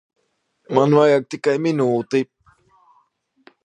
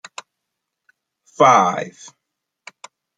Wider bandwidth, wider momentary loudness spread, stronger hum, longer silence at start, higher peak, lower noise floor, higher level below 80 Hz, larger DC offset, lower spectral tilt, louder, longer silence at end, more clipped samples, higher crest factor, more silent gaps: about the same, 9.8 kHz vs 9.4 kHz; second, 9 LU vs 25 LU; neither; second, 0.7 s vs 1.4 s; about the same, 0 dBFS vs -2 dBFS; second, -69 dBFS vs -79 dBFS; about the same, -70 dBFS vs -70 dBFS; neither; first, -7 dB/octave vs -4 dB/octave; second, -18 LUFS vs -15 LUFS; about the same, 1.4 s vs 1.3 s; neither; about the same, 20 dB vs 20 dB; neither